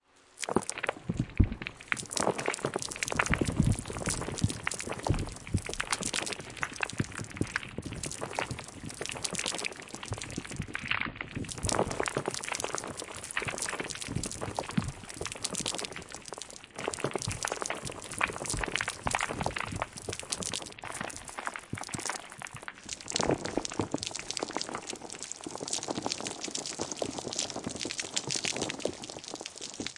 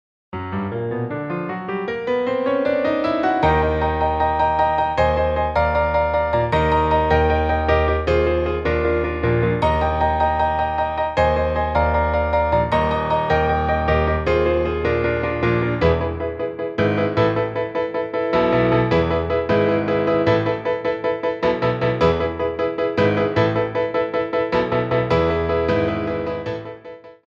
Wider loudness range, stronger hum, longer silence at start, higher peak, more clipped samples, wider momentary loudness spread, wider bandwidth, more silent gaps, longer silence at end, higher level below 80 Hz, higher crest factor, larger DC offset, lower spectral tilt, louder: about the same, 4 LU vs 2 LU; neither; about the same, 0.35 s vs 0.35 s; about the same, -6 dBFS vs -4 dBFS; neither; about the same, 9 LU vs 7 LU; first, 11.5 kHz vs 7.4 kHz; neither; second, 0 s vs 0.15 s; second, -48 dBFS vs -32 dBFS; first, 28 dB vs 16 dB; neither; second, -3 dB/octave vs -8 dB/octave; second, -34 LUFS vs -20 LUFS